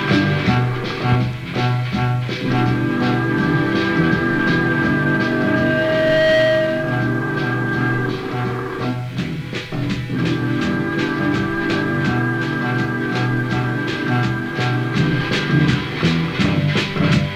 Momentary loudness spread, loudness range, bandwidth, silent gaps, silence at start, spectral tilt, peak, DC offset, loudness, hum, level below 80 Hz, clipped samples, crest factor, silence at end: 6 LU; 5 LU; 12.5 kHz; none; 0 s; -7 dB/octave; -2 dBFS; under 0.1%; -19 LUFS; none; -42 dBFS; under 0.1%; 16 dB; 0 s